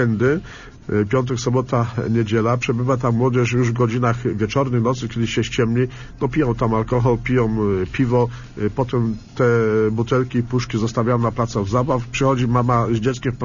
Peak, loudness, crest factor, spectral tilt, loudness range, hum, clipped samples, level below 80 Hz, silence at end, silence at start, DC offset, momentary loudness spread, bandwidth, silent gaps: -4 dBFS; -20 LUFS; 16 dB; -7 dB/octave; 1 LU; none; under 0.1%; -40 dBFS; 0 s; 0 s; under 0.1%; 5 LU; 7.4 kHz; none